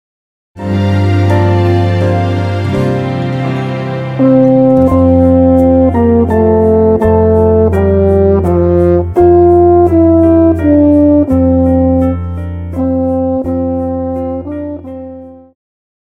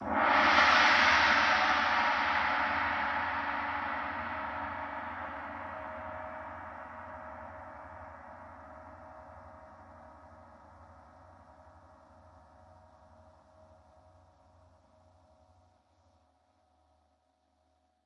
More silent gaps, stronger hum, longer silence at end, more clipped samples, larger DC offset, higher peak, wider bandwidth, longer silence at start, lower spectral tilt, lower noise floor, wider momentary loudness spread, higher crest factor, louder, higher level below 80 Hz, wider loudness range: neither; neither; second, 0.7 s vs 7.1 s; neither; neither; first, 0 dBFS vs -10 dBFS; second, 6.6 kHz vs 9.2 kHz; first, 0.55 s vs 0 s; first, -10 dB/octave vs -3 dB/octave; second, -29 dBFS vs -74 dBFS; second, 11 LU vs 27 LU; second, 10 dB vs 24 dB; first, -10 LUFS vs -28 LUFS; first, -28 dBFS vs -62 dBFS; second, 7 LU vs 27 LU